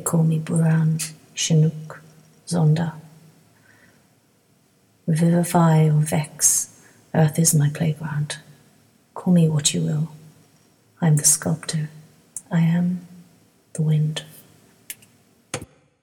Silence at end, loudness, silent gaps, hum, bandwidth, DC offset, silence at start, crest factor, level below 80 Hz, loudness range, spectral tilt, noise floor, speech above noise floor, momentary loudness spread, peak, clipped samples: 0.4 s; -20 LUFS; none; none; 17 kHz; under 0.1%; 0 s; 20 dB; -62 dBFS; 6 LU; -5 dB/octave; -60 dBFS; 41 dB; 17 LU; -2 dBFS; under 0.1%